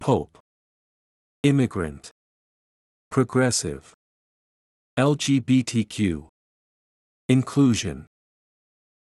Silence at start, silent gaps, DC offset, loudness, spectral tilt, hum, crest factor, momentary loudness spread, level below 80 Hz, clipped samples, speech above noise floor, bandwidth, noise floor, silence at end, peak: 0 s; 0.40-1.44 s, 2.11-3.11 s, 3.94-4.97 s, 6.29-7.29 s; under 0.1%; -23 LUFS; -5.5 dB/octave; none; 20 dB; 15 LU; -54 dBFS; under 0.1%; over 68 dB; 12 kHz; under -90 dBFS; 1.05 s; -6 dBFS